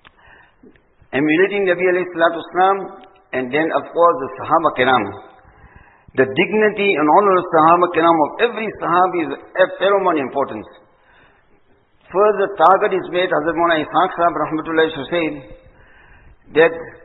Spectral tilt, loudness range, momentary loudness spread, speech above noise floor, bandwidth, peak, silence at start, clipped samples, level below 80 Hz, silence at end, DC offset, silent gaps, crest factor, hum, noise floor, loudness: -8.5 dB/octave; 4 LU; 10 LU; 38 dB; 4.1 kHz; 0 dBFS; 1.15 s; under 0.1%; -54 dBFS; 0.1 s; under 0.1%; none; 18 dB; none; -54 dBFS; -16 LUFS